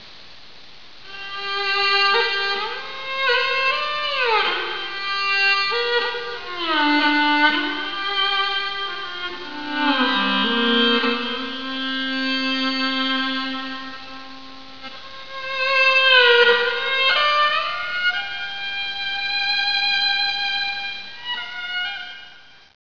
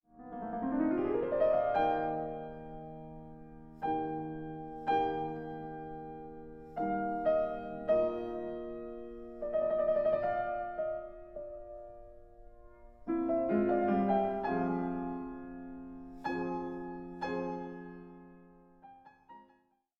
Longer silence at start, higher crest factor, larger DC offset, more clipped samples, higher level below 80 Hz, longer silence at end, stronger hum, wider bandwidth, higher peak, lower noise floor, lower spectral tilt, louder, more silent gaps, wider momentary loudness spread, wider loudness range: second, 0 s vs 0.15 s; about the same, 20 dB vs 18 dB; first, 1% vs under 0.1%; neither; about the same, -60 dBFS vs -58 dBFS; second, 0.25 s vs 0.55 s; neither; second, 5.4 kHz vs 6.6 kHz; first, 0 dBFS vs -18 dBFS; second, -46 dBFS vs -71 dBFS; second, -3 dB/octave vs -9 dB/octave; first, -19 LUFS vs -34 LUFS; neither; second, 15 LU vs 18 LU; about the same, 6 LU vs 7 LU